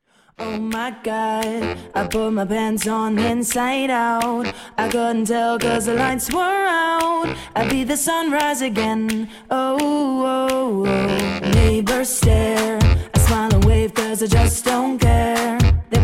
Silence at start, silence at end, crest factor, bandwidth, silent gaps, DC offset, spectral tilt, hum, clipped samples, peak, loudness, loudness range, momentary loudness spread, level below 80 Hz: 0.4 s; 0 s; 14 dB; 16.5 kHz; none; under 0.1%; -5 dB/octave; none; under 0.1%; -4 dBFS; -19 LUFS; 3 LU; 8 LU; -26 dBFS